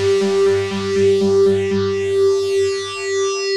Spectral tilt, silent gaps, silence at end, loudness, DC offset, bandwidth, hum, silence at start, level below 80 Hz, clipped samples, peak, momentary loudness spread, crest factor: -5 dB/octave; none; 0 s; -17 LUFS; under 0.1%; 11 kHz; none; 0 s; -56 dBFS; under 0.1%; -6 dBFS; 5 LU; 10 dB